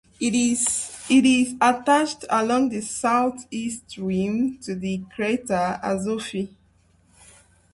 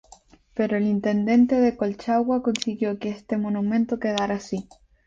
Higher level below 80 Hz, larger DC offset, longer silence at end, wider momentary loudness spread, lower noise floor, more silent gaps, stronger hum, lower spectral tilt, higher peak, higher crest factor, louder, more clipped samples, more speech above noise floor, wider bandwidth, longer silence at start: about the same, -58 dBFS vs -58 dBFS; neither; first, 1.25 s vs 0.45 s; about the same, 12 LU vs 10 LU; first, -60 dBFS vs -53 dBFS; neither; neither; second, -4 dB/octave vs -6 dB/octave; about the same, -6 dBFS vs -6 dBFS; about the same, 18 dB vs 18 dB; about the same, -23 LUFS vs -24 LUFS; neither; first, 37 dB vs 30 dB; first, 11.5 kHz vs 7.8 kHz; second, 0.2 s vs 0.55 s